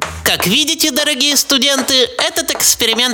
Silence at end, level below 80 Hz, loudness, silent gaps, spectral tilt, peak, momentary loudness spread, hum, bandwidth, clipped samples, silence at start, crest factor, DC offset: 0 s; -44 dBFS; -12 LUFS; none; -1 dB/octave; 0 dBFS; 4 LU; none; over 20 kHz; under 0.1%; 0 s; 14 dB; under 0.1%